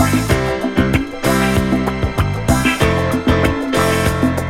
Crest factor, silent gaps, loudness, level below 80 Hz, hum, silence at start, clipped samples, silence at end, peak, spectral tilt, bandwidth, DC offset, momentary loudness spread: 16 dB; none; -16 LUFS; -26 dBFS; none; 0 s; under 0.1%; 0 s; 0 dBFS; -5.5 dB/octave; 17 kHz; under 0.1%; 3 LU